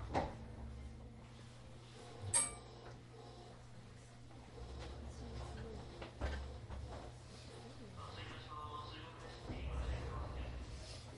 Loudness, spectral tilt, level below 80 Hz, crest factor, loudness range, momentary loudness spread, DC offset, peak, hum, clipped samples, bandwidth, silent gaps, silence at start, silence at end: -47 LUFS; -3.5 dB/octave; -52 dBFS; 26 dB; 7 LU; 14 LU; under 0.1%; -22 dBFS; none; under 0.1%; 11.5 kHz; none; 0 s; 0 s